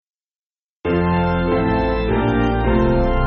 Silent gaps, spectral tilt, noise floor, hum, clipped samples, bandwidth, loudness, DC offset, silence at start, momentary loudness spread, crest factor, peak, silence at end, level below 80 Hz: none; -6.5 dB/octave; under -90 dBFS; none; under 0.1%; 6.6 kHz; -18 LUFS; under 0.1%; 0.85 s; 3 LU; 14 dB; -4 dBFS; 0 s; -26 dBFS